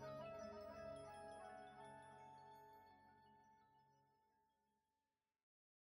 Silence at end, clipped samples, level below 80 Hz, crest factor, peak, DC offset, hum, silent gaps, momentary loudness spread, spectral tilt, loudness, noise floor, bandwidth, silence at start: 1.35 s; under 0.1%; -84 dBFS; 16 dB; -44 dBFS; under 0.1%; none; none; 11 LU; -5.5 dB/octave; -58 LUFS; under -90 dBFS; 16 kHz; 0 s